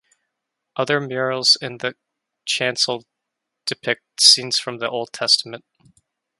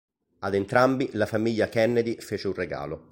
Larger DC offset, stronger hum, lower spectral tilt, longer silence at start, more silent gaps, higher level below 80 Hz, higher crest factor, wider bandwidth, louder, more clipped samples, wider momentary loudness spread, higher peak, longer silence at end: neither; neither; second, -1.5 dB/octave vs -6.5 dB/octave; first, 0.75 s vs 0.4 s; neither; second, -72 dBFS vs -58 dBFS; about the same, 22 dB vs 20 dB; second, 12 kHz vs 16.5 kHz; first, -18 LUFS vs -26 LUFS; neither; first, 18 LU vs 10 LU; first, 0 dBFS vs -6 dBFS; first, 0.8 s vs 0.1 s